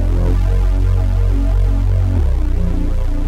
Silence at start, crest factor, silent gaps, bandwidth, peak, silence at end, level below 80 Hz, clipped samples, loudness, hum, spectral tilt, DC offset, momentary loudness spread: 0 s; 8 dB; none; 5.6 kHz; -6 dBFS; 0 s; -14 dBFS; under 0.1%; -17 LUFS; none; -8.5 dB/octave; under 0.1%; 3 LU